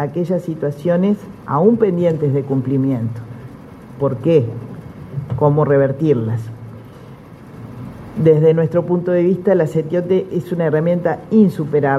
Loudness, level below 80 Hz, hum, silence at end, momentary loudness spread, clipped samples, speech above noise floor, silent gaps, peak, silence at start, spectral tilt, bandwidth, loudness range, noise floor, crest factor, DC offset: -16 LUFS; -50 dBFS; none; 0 s; 19 LU; under 0.1%; 22 dB; none; 0 dBFS; 0 s; -9.5 dB/octave; 12.5 kHz; 3 LU; -37 dBFS; 16 dB; under 0.1%